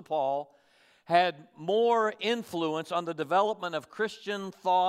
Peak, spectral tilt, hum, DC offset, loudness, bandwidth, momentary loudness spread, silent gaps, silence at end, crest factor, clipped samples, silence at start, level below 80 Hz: -10 dBFS; -5 dB/octave; none; under 0.1%; -29 LUFS; 15 kHz; 10 LU; none; 0 s; 18 dB; under 0.1%; 0 s; -82 dBFS